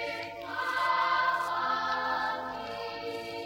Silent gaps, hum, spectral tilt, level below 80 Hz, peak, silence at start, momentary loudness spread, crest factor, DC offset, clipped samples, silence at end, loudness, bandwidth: none; none; -3 dB/octave; -66 dBFS; -16 dBFS; 0 s; 10 LU; 14 dB; under 0.1%; under 0.1%; 0 s; -31 LUFS; 16 kHz